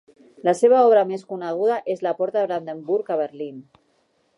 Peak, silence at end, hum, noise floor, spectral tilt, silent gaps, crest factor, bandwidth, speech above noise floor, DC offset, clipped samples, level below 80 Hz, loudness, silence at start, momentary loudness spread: -6 dBFS; 0.75 s; none; -65 dBFS; -6 dB/octave; none; 16 dB; 11.5 kHz; 45 dB; under 0.1%; under 0.1%; -78 dBFS; -21 LUFS; 0.45 s; 14 LU